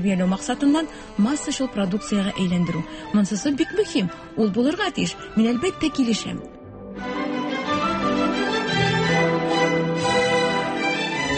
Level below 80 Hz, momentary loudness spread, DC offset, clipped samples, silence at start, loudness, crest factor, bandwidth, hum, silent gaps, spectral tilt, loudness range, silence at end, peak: -48 dBFS; 7 LU; under 0.1%; under 0.1%; 0 s; -22 LUFS; 14 dB; 8.8 kHz; none; none; -5 dB/octave; 3 LU; 0 s; -8 dBFS